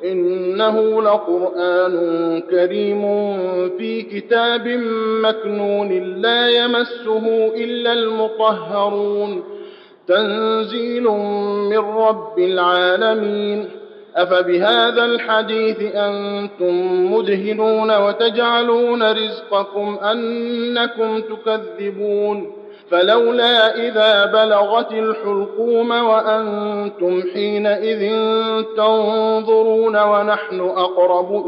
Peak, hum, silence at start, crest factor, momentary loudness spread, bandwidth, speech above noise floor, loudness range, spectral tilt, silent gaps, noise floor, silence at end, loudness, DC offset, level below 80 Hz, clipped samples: -2 dBFS; none; 0 s; 14 dB; 8 LU; 5.6 kHz; 21 dB; 4 LU; -6.5 dB/octave; none; -38 dBFS; 0 s; -17 LUFS; under 0.1%; -82 dBFS; under 0.1%